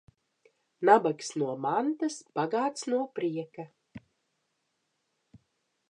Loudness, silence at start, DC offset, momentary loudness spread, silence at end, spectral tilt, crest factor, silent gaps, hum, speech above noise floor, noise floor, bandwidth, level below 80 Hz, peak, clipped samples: -29 LUFS; 0.8 s; under 0.1%; 15 LU; 1.9 s; -5 dB/octave; 24 dB; none; none; 50 dB; -79 dBFS; 11 kHz; -76 dBFS; -8 dBFS; under 0.1%